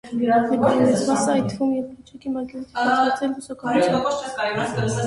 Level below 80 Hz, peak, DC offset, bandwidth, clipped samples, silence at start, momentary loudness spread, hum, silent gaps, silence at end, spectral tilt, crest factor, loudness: -54 dBFS; -6 dBFS; under 0.1%; 11.5 kHz; under 0.1%; 0.05 s; 11 LU; none; none; 0 s; -5.5 dB/octave; 16 dB; -21 LUFS